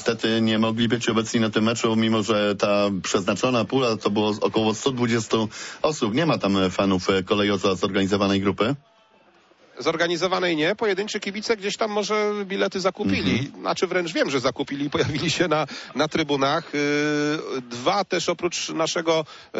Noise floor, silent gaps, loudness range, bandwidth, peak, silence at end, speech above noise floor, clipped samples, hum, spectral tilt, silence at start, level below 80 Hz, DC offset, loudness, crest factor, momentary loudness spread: -57 dBFS; none; 2 LU; 8 kHz; -8 dBFS; 0 s; 34 dB; under 0.1%; none; -4.5 dB/octave; 0 s; -58 dBFS; under 0.1%; -23 LUFS; 14 dB; 4 LU